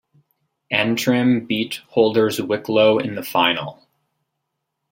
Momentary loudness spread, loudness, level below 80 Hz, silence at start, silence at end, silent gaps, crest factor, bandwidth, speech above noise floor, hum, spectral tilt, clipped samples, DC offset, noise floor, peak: 7 LU; -19 LUFS; -66 dBFS; 0.7 s; 1.2 s; none; 20 dB; 16.5 kHz; 59 dB; none; -5 dB/octave; under 0.1%; under 0.1%; -77 dBFS; -2 dBFS